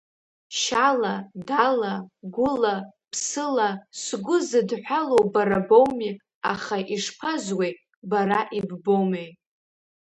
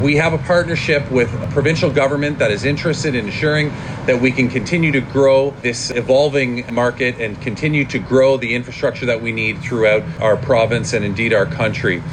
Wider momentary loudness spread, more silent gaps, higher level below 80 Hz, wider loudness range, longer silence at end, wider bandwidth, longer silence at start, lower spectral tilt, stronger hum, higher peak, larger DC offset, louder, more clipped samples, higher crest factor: first, 12 LU vs 5 LU; first, 6.35-6.41 s, 7.96-8.02 s vs none; second, -64 dBFS vs -42 dBFS; first, 4 LU vs 1 LU; first, 0.75 s vs 0 s; about the same, 11 kHz vs 10 kHz; first, 0.5 s vs 0 s; second, -4 dB/octave vs -5.5 dB/octave; neither; about the same, -4 dBFS vs -4 dBFS; neither; second, -24 LUFS vs -16 LUFS; neither; first, 20 dB vs 12 dB